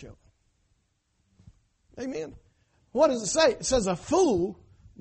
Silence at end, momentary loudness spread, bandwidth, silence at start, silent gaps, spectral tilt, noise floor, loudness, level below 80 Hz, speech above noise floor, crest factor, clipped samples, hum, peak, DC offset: 0.45 s; 14 LU; 8.8 kHz; 0 s; none; -4 dB/octave; -73 dBFS; -26 LUFS; -52 dBFS; 48 dB; 20 dB; under 0.1%; none; -8 dBFS; under 0.1%